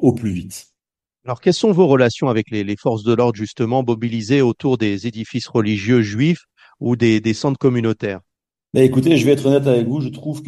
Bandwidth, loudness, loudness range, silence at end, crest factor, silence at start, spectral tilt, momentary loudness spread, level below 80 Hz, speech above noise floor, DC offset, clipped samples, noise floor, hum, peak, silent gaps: 12.5 kHz; -17 LUFS; 2 LU; 0 s; 16 dB; 0 s; -7 dB/octave; 11 LU; -54 dBFS; 69 dB; under 0.1%; under 0.1%; -86 dBFS; none; 0 dBFS; none